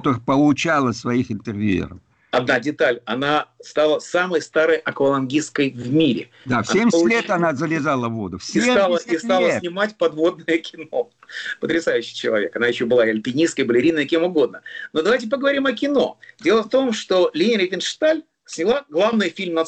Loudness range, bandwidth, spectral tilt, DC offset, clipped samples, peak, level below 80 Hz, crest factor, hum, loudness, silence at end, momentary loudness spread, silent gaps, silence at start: 2 LU; 9 kHz; -5 dB/octave; under 0.1%; under 0.1%; -8 dBFS; -58 dBFS; 12 dB; none; -20 LUFS; 0 s; 7 LU; none; 0 s